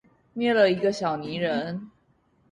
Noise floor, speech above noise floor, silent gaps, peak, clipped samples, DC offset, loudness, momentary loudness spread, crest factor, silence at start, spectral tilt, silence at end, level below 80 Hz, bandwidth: -65 dBFS; 41 dB; none; -8 dBFS; under 0.1%; under 0.1%; -25 LUFS; 15 LU; 18 dB; 0.35 s; -6 dB/octave; 0.6 s; -66 dBFS; 10.5 kHz